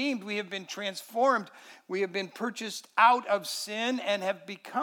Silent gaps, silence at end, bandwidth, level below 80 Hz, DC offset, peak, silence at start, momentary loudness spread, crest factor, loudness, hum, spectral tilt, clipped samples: none; 0 s; 19 kHz; under -90 dBFS; under 0.1%; -8 dBFS; 0 s; 14 LU; 22 dB; -29 LUFS; none; -3 dB/octave; under 0.1%